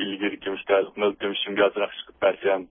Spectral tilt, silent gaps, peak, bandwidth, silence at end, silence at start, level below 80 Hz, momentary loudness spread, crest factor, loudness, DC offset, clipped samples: -8.5 dB/octave; none; -8 dBFS; 3.8 kHz; 0.05 s; 0 s; -64 dBFS; 7 LU; 18 dB; -25 LUFS; under 0.1%; under 0.1%